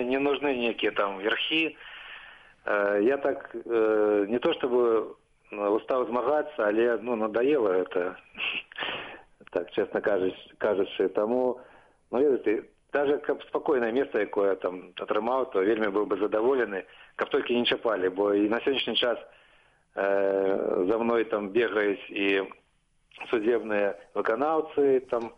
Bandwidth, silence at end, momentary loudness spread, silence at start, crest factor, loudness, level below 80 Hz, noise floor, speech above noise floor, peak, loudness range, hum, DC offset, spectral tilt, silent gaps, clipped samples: 5.4 kHz; 0.05 s; 9 LU; 0 s; 14 dB; -27 LUFS; -66 dBFS; -68 dBFS; 42 dB; -14 dBFS; 2 LU; none; under 0.1%; -6.5 dB/octave; none; under 0.1%